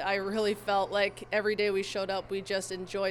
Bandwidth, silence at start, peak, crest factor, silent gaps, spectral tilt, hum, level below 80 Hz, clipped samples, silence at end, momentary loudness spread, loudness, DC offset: 18 kHz; 0 s; -14 dBFS; 16 dB; none; -3.5 dB/octave; none; -62 dBFS; under 0.1%; 0 s; 5 LU; -31 LUFS; under 0.1%